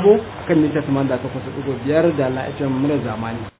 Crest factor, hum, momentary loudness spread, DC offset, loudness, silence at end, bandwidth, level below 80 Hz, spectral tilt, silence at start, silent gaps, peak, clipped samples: 18 dB; none; 9 LU; under 0.1%; -20 LUFS; 0.1 s; 4 kHz; -46 dBFS; -12 dB/octave; 0 s; none; -2 dBFS; under 0.1%